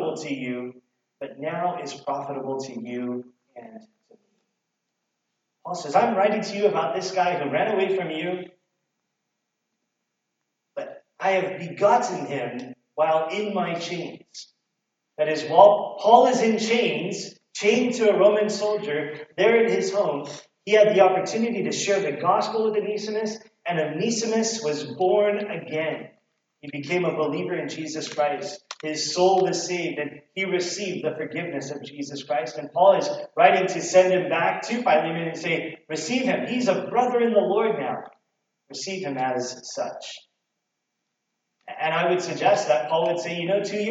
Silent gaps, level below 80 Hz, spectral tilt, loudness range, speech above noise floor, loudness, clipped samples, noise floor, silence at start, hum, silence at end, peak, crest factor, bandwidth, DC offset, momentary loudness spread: none; -84 dBFS; -4 dB/octave; 11 LU; 57 dB; -23 LUFS; under 0.1%; -80 dBFS; 0 s; none; 0 s; -2 dBFS; 22 dB; 9 kHz; under 0.1%; 16 LU